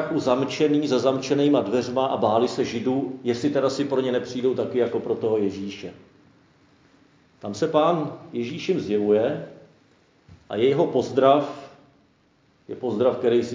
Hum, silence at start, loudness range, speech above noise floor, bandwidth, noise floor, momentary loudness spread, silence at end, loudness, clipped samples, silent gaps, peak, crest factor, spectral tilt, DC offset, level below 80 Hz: none; 0 s; 5 LU; 39 dB; 7.6 kHz; -61 dBFS; 13 LU; 0 s; -23 LUFS; under 0.1%; none; -4 dBFS; 20 dB; -6 dB/octave; under 0.1%; -64 dBFS